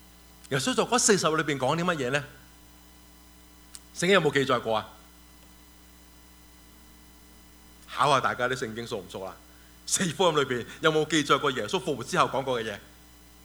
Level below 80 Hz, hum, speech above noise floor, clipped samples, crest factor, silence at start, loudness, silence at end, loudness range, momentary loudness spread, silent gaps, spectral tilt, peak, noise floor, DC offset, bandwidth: -58 dBFS; none; 27 dB; under 0.1%; 22 dB; 0.5 s; -26 LUFS; 0.6 s; 6 LU; 17 LU; none; -3.5 dB/octave; -6 dBFS; -53 dBFS; under 0.1%; over 20 kHz